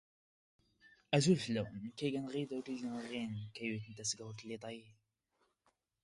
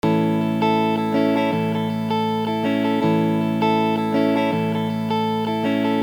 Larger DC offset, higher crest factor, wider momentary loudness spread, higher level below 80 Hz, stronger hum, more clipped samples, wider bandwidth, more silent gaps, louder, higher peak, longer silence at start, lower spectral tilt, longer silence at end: neither; first, 24 dB vs 12 dB; first, 14 LU vs 3 LU; second, -74 dBFS vs -64 dBFS; neither; neither; second, 11.5 kHz vs over 20 kHz; neither; second, -39 LUFS vs -20 LUFS; second, -16 dBFS vs -8 dBFS; first, 0.85 s vs 0.05 s; second, -5 dB/octave vs -7.5 dB/octave; first, 1.1 s vs 0 s